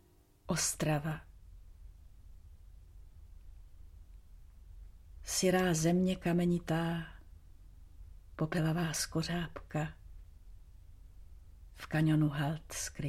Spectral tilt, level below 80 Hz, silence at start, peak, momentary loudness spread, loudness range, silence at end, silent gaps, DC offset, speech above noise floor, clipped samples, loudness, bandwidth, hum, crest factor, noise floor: -5 dB/octave; -54 dBFS; 0.45 s; -18 dBFS; 13 LU; 7 LU; 0 s; none; under 0.1%; 24 dB; under 0.1%; -33 LUFS; 15.5 kHz; none; 18 dB; -57 dBFS